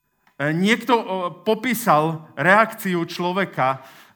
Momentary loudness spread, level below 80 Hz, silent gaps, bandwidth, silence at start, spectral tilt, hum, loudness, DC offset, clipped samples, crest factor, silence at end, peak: 9 LU; -74 dBFS; none; over 20 kHz; 0.4 s; -5 dB/octave; none; -20 LUFS; under 0.1%; under 0.1%; 20 dB; 0.25 s; 0 dBFS